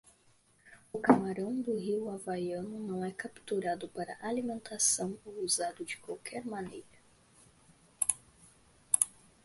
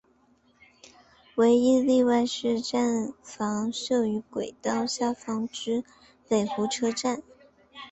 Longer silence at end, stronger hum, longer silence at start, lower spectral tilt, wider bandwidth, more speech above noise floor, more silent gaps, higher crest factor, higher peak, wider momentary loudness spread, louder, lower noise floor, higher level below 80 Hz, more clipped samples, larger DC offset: first, 0.35 s vs 0 s; neither; second, 0.65 s vs 1.35 s; about the same, -3.5 dB/octave vs -4.5 dB/octave; first, 12 kHz vs 8.2 kHz; second, 33 dB vs 38 dB; neither; first, 28 dB vs 16 dB; about the same, -8 dBFS vs -10 dBFS; about the same, 13 LU vs 11 LU; second, -34 LUFS vs -26 LUFS; first, -67 dBFS vs -63 dBFS; about the same, -70 dBFS vs -66 dBFS; neither; neither